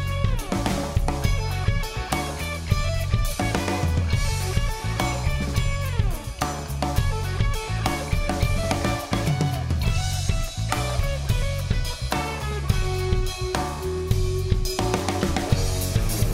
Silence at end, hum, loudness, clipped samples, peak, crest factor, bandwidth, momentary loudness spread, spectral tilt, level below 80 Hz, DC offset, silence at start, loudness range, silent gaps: 0 s; none; -25 LUFS; under 0.1%; -4 dBFS; 18 dB; 16 kHz; 3 LU; -5 dB/octave; -28 dBFS; under 0.1%; 0 s; 1 LU; none